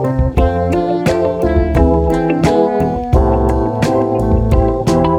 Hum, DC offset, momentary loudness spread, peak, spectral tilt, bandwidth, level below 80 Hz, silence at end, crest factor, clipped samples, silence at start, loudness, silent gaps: none; under 0.1%; 3 LU; 0 dBFS; -8 dB/octave; 13 kHz; -20 dBFS; 0 s; 12 dB; under 0.1%; 0 s; -14 LUFS; none